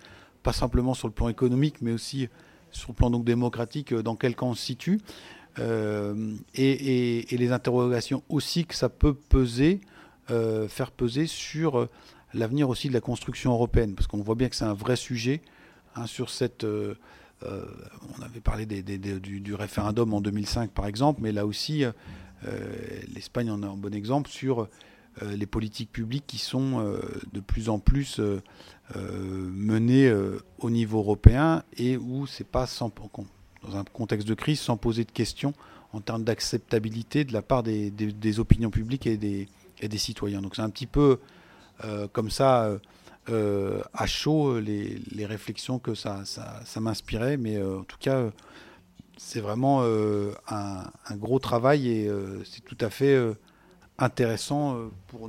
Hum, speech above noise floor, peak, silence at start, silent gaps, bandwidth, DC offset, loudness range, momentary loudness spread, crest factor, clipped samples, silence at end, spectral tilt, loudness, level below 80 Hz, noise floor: none; 30 dB; 0 dBFS; 0.05 s; none; 16 kHz; under 0.1%; 6 LU; 14 LU; 28 dB; under 0.1%; 0 s; -6.5 dB/octave; -28 LUFS; -38 dBFS; -57 dBFS